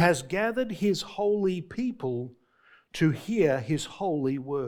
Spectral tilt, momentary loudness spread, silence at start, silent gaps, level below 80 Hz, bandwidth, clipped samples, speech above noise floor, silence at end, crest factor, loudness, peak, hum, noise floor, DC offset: -6 dB/octave; 8 LU; 0 s; none; -60 dBFS; 18 kHz; under 0.1%; 34 dB; 0 s; 20 dB; -28 LUFS; -6 dBFS; none; -61 dBFS; under 0.1%